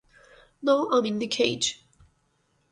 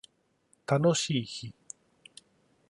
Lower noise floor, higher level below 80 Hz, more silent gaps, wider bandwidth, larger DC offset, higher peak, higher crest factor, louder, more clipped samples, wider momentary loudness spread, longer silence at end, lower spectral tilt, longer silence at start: about the same, -70 dBFS vs -70 dBFS; about the same, -66 dBFS vs -70 dBFS; neither; about the same, 11 kHz vs 11.5 kHz; neither; first, -8 dBFS vs -14 dBFS; about the same, 20 dB vs 18 dB; first, -25 LUFS vs -29 LUFS; neither; second, 8 LU vs 22 LU; second, 0.95 s vs 1.2 s; second, -3 dB/octave vs -5 dB/octave; about the same, 0.6 s vs 0.7 s